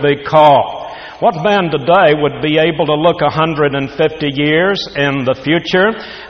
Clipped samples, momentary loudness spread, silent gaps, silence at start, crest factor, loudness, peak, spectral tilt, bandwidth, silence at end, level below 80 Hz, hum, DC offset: under 0.1%; 7 LU; none; 0 s; 12 dB; -13 LUFS; 0 dBFS; -6.5 dB/octave; 6.6 kHz; 0 s; -46 dBFS; none; under 0.1%